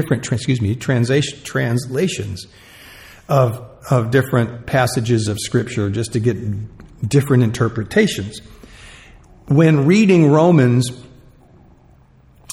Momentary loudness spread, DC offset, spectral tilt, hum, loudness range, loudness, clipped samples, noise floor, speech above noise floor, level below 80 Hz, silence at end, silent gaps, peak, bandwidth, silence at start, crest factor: 15 LU; under 0.1%; -6.5 dB/octave; none; 5 LU; -17 LUFS; under 0.1%; -49 dBFS; 33 dB; -46 dBFS; 0 s; none; 0 dBFS; 16 kHz; 0 s; 16 dB